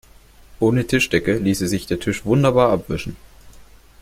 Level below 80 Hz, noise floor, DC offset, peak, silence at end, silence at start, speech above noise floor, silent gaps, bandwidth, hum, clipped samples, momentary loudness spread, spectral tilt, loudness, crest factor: -42 dBFS; -47 dBFS; under 0.1%; -2 dBFS; 0.4 s; 0.6 s; 29 dB; none; 16.5 kHz; none; under 0.1%; 9 LU; -6 dB/octave; -19 LUFS; 18 dB